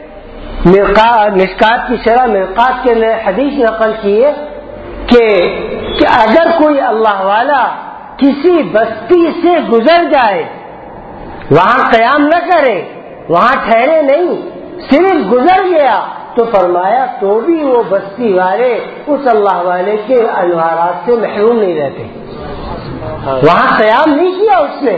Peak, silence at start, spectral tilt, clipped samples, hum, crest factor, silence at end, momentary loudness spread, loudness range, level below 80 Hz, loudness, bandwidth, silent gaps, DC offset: 0 dBFS; 0 s; -7.5 dB/octave; 0.6%; none; 10 dB; 0 s; 16 LU; 2 LU; -36 dBFS; -10 LUFS; 8 kHz; none; under 0.1%